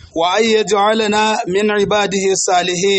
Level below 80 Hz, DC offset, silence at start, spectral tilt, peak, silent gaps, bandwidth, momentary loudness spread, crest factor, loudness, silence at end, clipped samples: -50 dBFS; under 0.1%; 0.15 s; -3 dB/octave; -2 dBFS; none; 8.8 kHz; 2 LU; 12 dB; -14 LUFS; 0 s; under 0.1%